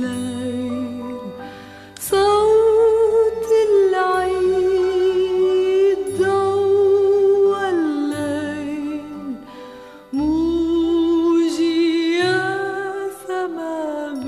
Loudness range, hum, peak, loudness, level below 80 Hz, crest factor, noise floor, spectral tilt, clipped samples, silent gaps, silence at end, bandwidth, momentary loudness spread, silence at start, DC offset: 5 LU; none; -6 dBFS; -18 LUFS; -48 dBFS; 12 dB; -39 dBFS; -5 dB/octave; under 0.1%; none; 0 s; 14 kHz; 15 LU; 0 s; under 0.1%